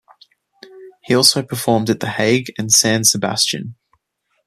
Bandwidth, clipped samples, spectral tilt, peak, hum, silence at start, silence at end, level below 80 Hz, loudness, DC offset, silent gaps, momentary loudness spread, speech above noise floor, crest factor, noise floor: 15 kHz; under 0.1%; -2.5 dB/octave; 0 dBFS; none; 0.75 s; 0.75 s; -58 dBFS; -15 LUFS; under 0.1%; none; 8 LU; 52 dB; 18 dB; -69 dBFS